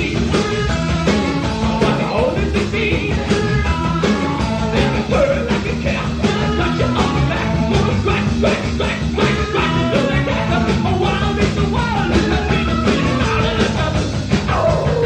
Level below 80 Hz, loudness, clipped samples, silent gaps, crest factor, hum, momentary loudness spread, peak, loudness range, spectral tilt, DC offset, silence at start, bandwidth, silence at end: -26 dBFS; -17 LUFS; under 0.1%; none; 14 dB; none; 3 LU; -2 dBFS; 1 LU; -6 dB/octave; under 0.1%; 0 s; 9.6 kHz; 0 s